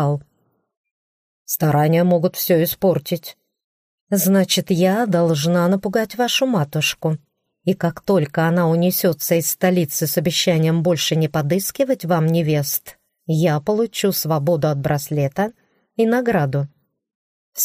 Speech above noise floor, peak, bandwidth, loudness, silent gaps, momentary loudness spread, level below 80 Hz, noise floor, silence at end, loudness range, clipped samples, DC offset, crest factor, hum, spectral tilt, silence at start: 48 dB; -4 dBFS; 15.5 kHz; -19 LUFS; 0.77-0.84 s, 0.91-1.46 s, 3.64-4.07 s, 17.15-17.52 s; 8 LU; -56 dBFS; -66 dBFS; 0 s; 2 LU; under 0.1%; under 0.1%; 16 dB; none; -5 dB/octave; 0 s